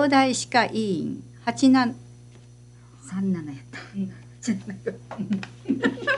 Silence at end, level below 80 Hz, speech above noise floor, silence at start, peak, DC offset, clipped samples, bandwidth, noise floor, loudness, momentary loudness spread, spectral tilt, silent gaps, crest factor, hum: 0 s; -60 dBFS; 24 dB; 0 s; -4 dBFS; under 0.1%; under 0.1%; 11.5 kHz; -48 dBFS; -25 LUFS; 16 LU; -4.5 dB/octave; none; 20 dB; 60 Hz at -45 dBFS